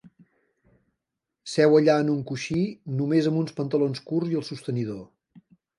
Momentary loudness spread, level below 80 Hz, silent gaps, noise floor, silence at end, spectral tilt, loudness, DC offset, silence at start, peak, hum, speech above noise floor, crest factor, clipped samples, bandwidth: 12 LU; -66 dBFS; none; -84 dBFS; 0.4 s; -7 dB/octave; -25 LUFS; under 0.1%; 1.45 s; -8 dBFS; none; 61 dB; 18 dB; under 0.1%; 11.5 kHz